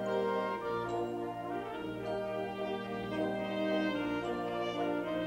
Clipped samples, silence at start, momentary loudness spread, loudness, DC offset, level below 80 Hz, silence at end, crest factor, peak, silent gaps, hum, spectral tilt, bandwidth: under 0.1%; 0 s; 6 LU; -36 LUFS; under 0.1%; -64 dBFS; 0 s; 14 dB; -22 dBFS; none; none; -6.5 dB/octave; 16 kHz